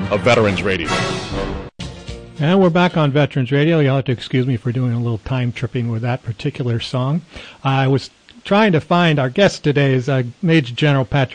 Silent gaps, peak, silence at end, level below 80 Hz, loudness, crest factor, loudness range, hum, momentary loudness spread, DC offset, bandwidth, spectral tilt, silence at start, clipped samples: none; -4 dBFS; 0 s; -42 dBFS; -17 LUFS; 14 dB; 5 LU; none; 11 LU; under 0.1%; 10 kHz; -6.5 dB/octave; 0 s; under 0.1%